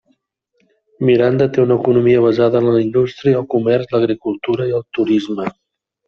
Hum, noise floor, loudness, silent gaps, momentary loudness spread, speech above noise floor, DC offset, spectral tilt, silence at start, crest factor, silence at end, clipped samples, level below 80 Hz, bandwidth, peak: none; -66 dBFS; -15 LUFS; none; 7 LU; 51 dB; under 0.1%; -8.5 dB/octave; 1 s; 12 dB; 0.55 s; under 0.1%; -54 dBFS; 6.6 kHz; -2 dBFS